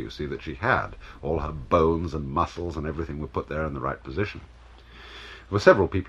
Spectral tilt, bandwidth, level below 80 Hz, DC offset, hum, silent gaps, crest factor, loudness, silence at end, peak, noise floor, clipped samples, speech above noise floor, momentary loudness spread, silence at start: -7 dB/octave; 10.5 kHz; -42 dBFS; under 0.1%; none; none; 24 dB; -26 LUFS; 0 s; -2 dBFS; -47 dBFS; under 0.1%; 22 dB; 20 LU; 0 s